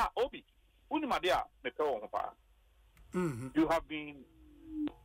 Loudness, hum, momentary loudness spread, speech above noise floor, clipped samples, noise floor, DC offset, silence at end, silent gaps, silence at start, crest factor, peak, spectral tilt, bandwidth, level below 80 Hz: -35 LUFS; none; 13 LU; 31 dB; under 0.1%; -66 dBFS; under 0.1%; 0.1 s; none; 0 s; 16 dB; -22 dBFS; -5.5 dB/octave; 16 kHz; -58 dBFS